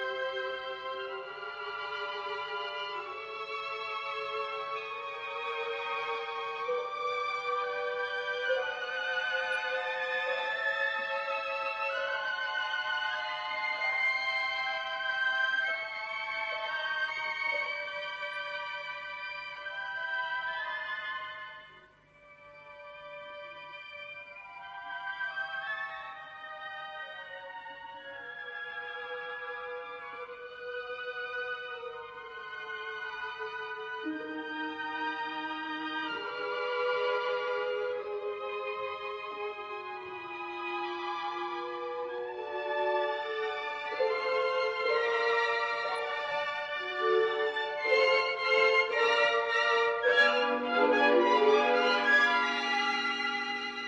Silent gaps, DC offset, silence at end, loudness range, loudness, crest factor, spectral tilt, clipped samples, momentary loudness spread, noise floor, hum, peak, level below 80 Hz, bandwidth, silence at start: none; under 0.1%; 0 s; 14 LU; -32 LUFS; 20 dB; -2.5 dB/octave; under 0.1%; 16 LU; -59 dBFS; none; -14 dBFS; -76 dBFS; 9.6 kHz; 0 s